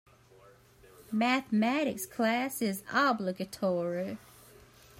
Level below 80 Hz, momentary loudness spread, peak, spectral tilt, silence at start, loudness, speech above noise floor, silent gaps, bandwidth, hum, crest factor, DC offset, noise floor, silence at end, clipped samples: -70 dBFS; 9 LU; -14 dBFS; -4.5 dB/octave; 1.1 s; -31 LUFS; 28 dB; none; 16 kHz; none; 20 dB; under 0.1%; -59 dBFS; 0.85 s; under 0.1%